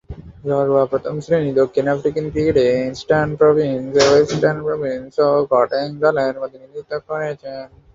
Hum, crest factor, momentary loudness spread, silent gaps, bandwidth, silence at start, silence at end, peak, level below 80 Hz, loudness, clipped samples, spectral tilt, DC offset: none; 16 dB; 14 LU; none; 7.8 kHz; 0.1 s; 0.3 s; -2 dBFS; -46 dBFS; -17 LUFS; under 0.1%; -5.5 dB/octave; under 0.1%